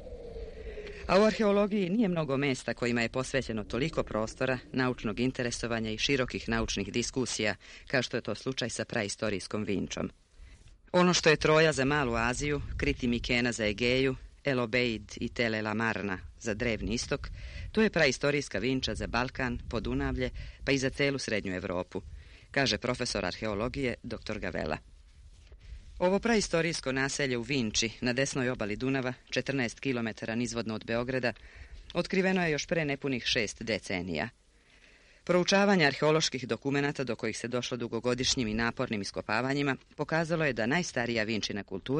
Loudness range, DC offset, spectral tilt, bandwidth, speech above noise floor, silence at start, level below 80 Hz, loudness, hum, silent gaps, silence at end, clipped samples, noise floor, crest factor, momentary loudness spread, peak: 5 LU; under 0.1%; -4.5 dB/octave; 10.5 kHz; 30 dB; 0 s; -48 dBFS; -30 LUFS; none; none; 0 s; under 0.1%; -61 dBFS; 20 dB; 10 LU; -10 dBFS